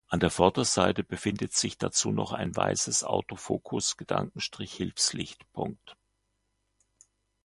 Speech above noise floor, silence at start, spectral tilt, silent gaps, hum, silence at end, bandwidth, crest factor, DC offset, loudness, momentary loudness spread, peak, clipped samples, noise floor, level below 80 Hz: 48 dB; 0.1 s; -3.5 dB/octave; none; none; 1.5 s; 11.5 kHz; 26 dB; under 0.1%; -29 LUFS; 12 LU; -4 dBFS; under 0.1%; -77 dBFS; -54 dBFS